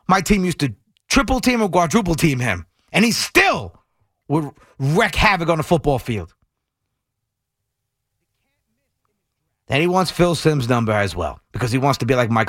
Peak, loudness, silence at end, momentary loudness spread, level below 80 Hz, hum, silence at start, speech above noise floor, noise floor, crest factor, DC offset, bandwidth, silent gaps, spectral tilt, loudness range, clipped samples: -2 dBFS; -18 LUFS; 0 s; 11 LU; -36 dBFS; none; 0.1 s; 61 dB; -78 dBFS; 18 dB; under 0.1%; 16.5 kHz; none; -5 dB/octave; 8 LU; under 0.1%